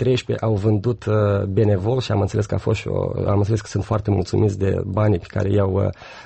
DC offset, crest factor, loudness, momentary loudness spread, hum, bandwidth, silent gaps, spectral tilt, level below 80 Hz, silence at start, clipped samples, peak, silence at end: under 0.1%; 12 dB; -21 LUFS; 4 LU; none; 8.4 kHz; none; -7.5 dB/octave; -44 dBFS; 0 s; under 0.1%; -8 dBFS; 0 s